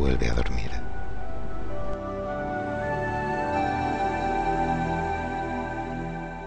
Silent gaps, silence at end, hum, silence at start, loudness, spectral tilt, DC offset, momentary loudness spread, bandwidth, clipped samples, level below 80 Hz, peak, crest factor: none; 0 s; none; 0 s; -29 LUFS; -7 dB/octave; under 0.1%; 10 LU; 9.4 kHz; under 0.1%; -36 dBFS; -10 dBFS; 16 dB